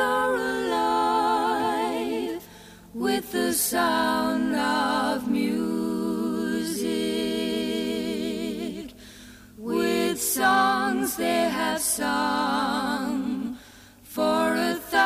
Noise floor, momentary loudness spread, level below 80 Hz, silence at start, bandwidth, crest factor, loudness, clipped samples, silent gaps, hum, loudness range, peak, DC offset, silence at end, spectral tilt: -49 dBFS; 10 LU; -56 dBFS; 0 s; 15.5 kHz; 16 dB; -25 LUFS; under 0.1%; none; none; 4 LU; -10 dBFS; under 0.1%; 0 s; -3 dB/octave